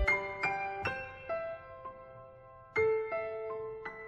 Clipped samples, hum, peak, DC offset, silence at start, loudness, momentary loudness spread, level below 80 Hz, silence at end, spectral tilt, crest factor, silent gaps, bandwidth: under 0.1%; none; -18 dBFS; under 0.1%; 0 s; -35 LUFS; 20 LU; -52 dBFS; 0 s; -5.5 dB/octave; 18 dB; none; 9.6 kHz